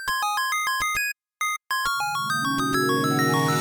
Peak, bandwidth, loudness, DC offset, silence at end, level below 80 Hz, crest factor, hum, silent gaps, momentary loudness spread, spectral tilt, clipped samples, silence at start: -10 dBFS; over 20 kHz; -24 LUFS; under 0.1%; 0 s; -54 dBFS; 14 dB; none; none; 6 LU; -3.5 dB/octave; under 0.1%; 0 s